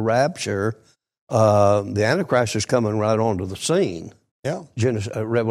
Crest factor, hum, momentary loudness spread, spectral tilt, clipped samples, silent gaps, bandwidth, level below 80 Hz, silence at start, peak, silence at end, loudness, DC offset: 16 dB; none; 12 LU; -5.5 dB/octave; under 0.1%; 1.21-1.27 s, 4.31-4.43 s; 14 kHz; -56 dBFS; 0 s; -4 dBFS; 0 s; -21 LUFS; under 0.1%